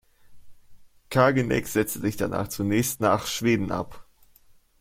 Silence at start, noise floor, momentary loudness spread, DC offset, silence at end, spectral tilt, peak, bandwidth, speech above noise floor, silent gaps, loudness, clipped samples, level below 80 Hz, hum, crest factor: 0.3 s; -56 dBFS; 8 LU; under 0.1%; 0.8 s; -5 dB/octave; -4 dBFS; 16.5 kHz; 32 dB; none; -25 LUFS; under 0.1%; -52 dBFS; none; 22 dB